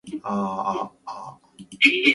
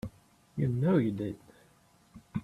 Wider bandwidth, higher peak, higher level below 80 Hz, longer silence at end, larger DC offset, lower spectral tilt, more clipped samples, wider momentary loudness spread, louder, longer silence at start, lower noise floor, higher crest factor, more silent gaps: second, 11.5 kHz vs 13 kHz; first, -2 dBFS vs -14 dBFS; about the same, -66 dBFS vs -62 dBFS; about the same, 0 s vs 0 s; neither; second, -4 dB/octave vs -9.5 dB/octave; neither; about the same, 20 LU vs 18 LU; first, -22 LUFS vs -31 LUFS; about the same, 0.05 s vs 0.05 s; second, -45 dBFS vs -64 dBFS; about the same, 22 dB vs 18 dB; neither